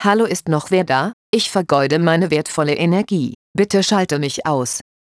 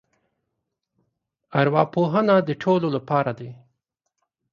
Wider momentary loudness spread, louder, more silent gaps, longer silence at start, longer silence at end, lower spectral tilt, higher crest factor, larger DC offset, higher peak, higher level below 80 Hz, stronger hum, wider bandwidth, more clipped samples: second, 5 LU vs 10 LU; first, -17 LUFS vs -21 LUFS; first, 1.13-1.33 s, 3.35-3.54 s vs none; second, 0 s vs 1.5 s; second, 0.2 s vs 1 s; second, -5 dB/octave vs -8.5 dB/octave; about the same, 16 dB vs 20 dB; neither; about the same, -2 dBFS vs -4 dBFS; first, -58 dBFS vs -66 dBFS; neither; first, 11 kHz vs 7 kHz; neither